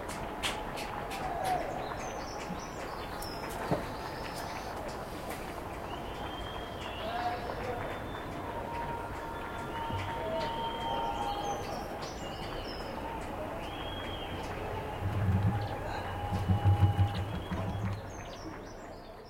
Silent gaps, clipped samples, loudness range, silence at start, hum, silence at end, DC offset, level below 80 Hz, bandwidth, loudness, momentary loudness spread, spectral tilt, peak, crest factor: none; under 0.1%; 6 LU; 0 s; none; 0 s; under 0.1%; -48 dBFS; 16 kHz; -36 LUFS; 8 LU; -5.5 dB/octave; -14 dBFS; 20 dB